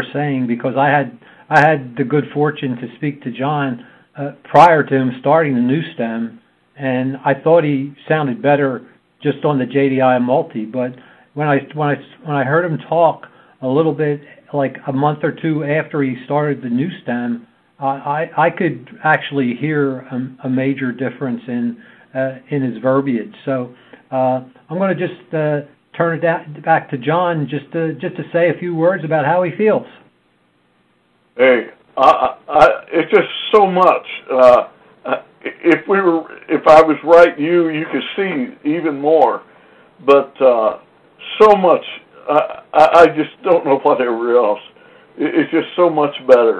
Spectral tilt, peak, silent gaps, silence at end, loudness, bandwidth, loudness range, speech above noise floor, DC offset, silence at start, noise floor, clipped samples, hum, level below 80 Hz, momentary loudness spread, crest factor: -7.5 dB/octave; 0 dBFS; none; 0 s; -16 LUFS; 9.6 kHz; 7 LU; 43 dB; under 0.1%; 0 s; -58 dBFS; 0.1%; none; -56 dBFS; 13 LU; 16 dB